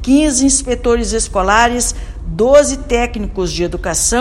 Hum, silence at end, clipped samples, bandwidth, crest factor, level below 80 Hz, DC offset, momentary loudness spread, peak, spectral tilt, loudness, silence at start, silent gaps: none; 0 s; 0.3%; 16 kHz; 14 dB; -24 dBFS; under 0.1%; 9 LU; 0 dBFS; -3.5 dB/octave; -14 LUFS; 0 s; none